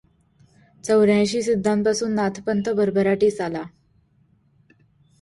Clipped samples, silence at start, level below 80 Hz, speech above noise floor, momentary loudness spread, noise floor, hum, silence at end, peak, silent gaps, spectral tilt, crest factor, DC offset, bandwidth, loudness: under 0.1%; 0.85 s; -58 dBFS; 41 dB; 11 LU; -61 dBFS; none; 1.55 s; -8 dBFS; none; -5.5 dB/octave; 16 dB; under 0.1%; 11.5 kHz; -21 LUFS